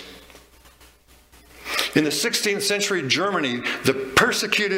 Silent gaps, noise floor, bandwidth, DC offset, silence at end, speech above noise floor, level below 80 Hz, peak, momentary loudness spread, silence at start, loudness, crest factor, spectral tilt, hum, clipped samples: none; -53 dBFS; 16.5 kHz; under 0.1%; 0 s; 31 dB; -54 dBFS; -2 dBFS; 6 LU; 0 s; -21 LUFS; 22 dB; -2.5 dB/octave; none; under 0.1%